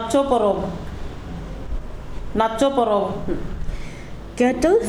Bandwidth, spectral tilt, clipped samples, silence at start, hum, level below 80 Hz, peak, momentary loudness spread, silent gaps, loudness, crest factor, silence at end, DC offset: 13.5 kHz; -6 dB/octave; under 0.1%; 0 s; none; -32 dBFS; -4 dBFS; 17 LU; none; -21 LUFS; 18 dB; 0 s; under 0.1%